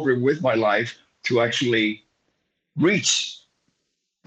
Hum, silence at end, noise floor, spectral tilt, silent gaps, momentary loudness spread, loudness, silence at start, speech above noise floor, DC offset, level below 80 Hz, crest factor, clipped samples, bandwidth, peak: none; 0.9 s; -77 dBFS; -3.5 dB/octave; none; 12 LU; -21 LUFS; 0 s; 56 dB; under 0.1%; -68 dBFS; 18 dB; under 0.1%; 9.4 kHz; -6 dBFS